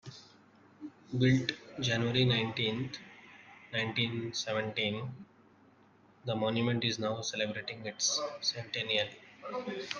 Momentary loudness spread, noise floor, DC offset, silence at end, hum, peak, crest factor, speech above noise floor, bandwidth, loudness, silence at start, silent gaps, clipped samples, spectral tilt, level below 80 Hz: 22 LU; -63 dBFS; under 0.1%; 0 s; none; -14 dBFS; 20 dB; 30 dB; 10 kHz; -33 LUFS; 0.05 s; none; under 0.1%; -4 dB/octave; -68 dBFS